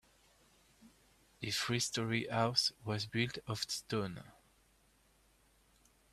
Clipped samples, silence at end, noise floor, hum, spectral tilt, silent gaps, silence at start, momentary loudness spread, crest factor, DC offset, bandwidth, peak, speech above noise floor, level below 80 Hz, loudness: under 0.1%; 1.8 s; -70 dBFS; none; -3.5 dB/octave; none; 0.8 s; 8 LU; 24 dB; under 0.1%; 15 kHz; -16 dBFS; 33 dB; -70 dBFS; -36 LUFS